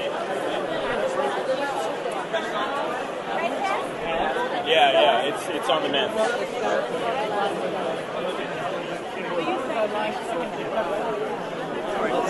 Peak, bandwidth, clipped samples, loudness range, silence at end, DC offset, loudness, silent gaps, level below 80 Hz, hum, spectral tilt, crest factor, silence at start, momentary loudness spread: -6 dBFS; 11.5 kHz; under 0.1%; 5 LU; 0 s; under 0.1%; -25 LUFS; none; -58 dBFS; none; -4 dB/octave; 20 dB; 0 s; 7 LU